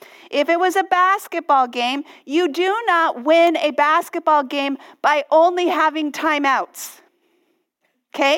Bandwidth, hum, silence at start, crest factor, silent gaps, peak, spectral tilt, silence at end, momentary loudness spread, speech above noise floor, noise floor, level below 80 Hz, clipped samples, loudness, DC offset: 17 kHz; none; 0.3 s; 16 dB; none; -2 dBFS; -1.5 dB/octave; 0 s; 8 LU; 52 dB; -70 dBFS; -72 dBFS; under 0.1%; -18 LUFS; under 0.1%